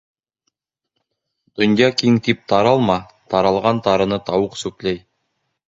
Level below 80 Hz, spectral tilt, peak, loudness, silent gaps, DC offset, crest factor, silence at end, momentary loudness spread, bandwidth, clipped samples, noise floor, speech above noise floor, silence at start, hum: -50 dBFS; -6 dB/octave; 0 dBFS; -18 LUFS; none; under 0.1%; 20 dB; 0.7 s; 10 LU; 8 kHz; under 0.1%; -77 dBFS; 60 dB; 1.6 s; none